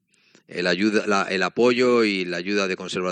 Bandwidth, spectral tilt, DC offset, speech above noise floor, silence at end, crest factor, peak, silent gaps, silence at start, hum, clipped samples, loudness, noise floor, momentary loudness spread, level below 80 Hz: 9.8 kHz; -4.5 dB/octave; under 0.1%; 36 dB; 0 s; 16 dB; -6 dBFS; none; 0.5 s; none; under 0.1%; -21 LUFS; -57 dBFS; 7 LU; -72 dBFS